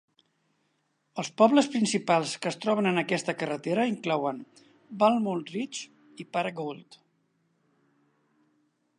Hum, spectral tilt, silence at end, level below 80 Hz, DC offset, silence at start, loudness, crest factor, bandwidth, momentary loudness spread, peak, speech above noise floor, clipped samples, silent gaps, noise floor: none; -5 dB/octave; 2.15 s; -80 dBFS; under 0.1%; 1.15 s; -27 LUFS; 22 dB; 11 kHz; 16 LU; -8 dBFS; 47 dB; under 0.1%; none; -74 dBFS